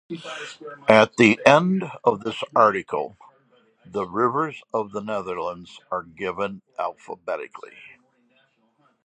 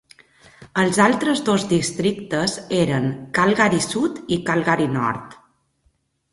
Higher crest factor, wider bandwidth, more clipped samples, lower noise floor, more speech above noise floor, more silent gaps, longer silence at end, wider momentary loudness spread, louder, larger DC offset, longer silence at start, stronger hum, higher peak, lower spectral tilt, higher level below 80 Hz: first, 24 dB vs 18 dB; second, 10 kHz vs 11.5 kHz; neither; about the same, -64 dBFS vs -65 dBFS; second, 42 dB vs 46 dB; neither; first, 1.2 s vs 1 s; first, 18 LU vs 7 LU; about the same, -22 LUFS vs -20 LUFS; neither; second, 0.1 s vs 0.6 s; neither; about the same, 0 dBFS vs -2 dBFS; about the same, -5.5 dB/octave vs -5 dB/octave; second, -64 dBFS vs -54 dBFS